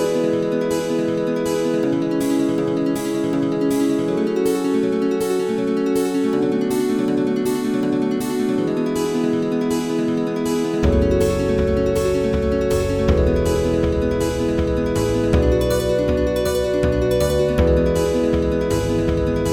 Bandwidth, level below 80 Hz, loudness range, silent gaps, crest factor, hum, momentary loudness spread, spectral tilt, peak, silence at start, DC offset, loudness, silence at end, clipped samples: 18.5 kHz; -30 dBFS; 2 LU; none; 16 dB; none; 3 LU; -6.5 dB/octave; -4 dBFS; 0 s; 0.1%; -19 LUFS; 0 s; under 0.1%